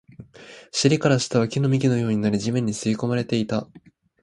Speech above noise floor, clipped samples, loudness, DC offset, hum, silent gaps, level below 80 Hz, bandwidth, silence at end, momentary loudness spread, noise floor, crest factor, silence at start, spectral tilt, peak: 22 dB; under 0.1%; -22 LUFS; under 0.1%; none; none; -58 dBFS; 11.5 kHz; 0.45 s; 7 LU; -44 dBFS; 20 dB; 0.2 s; -5.5 dB/octave; -4 dBFS